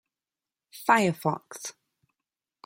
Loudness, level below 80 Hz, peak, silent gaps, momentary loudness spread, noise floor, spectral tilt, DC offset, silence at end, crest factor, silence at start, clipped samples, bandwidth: -26 LUFS; -72 dBFS; -6 dBFS; none; 17 LU; under -90 dBFS; -4.5 dB/octave; under 0.1%; 0.95 s; 26 dB; 0.75 s; under 0.1%; 16.5 kHz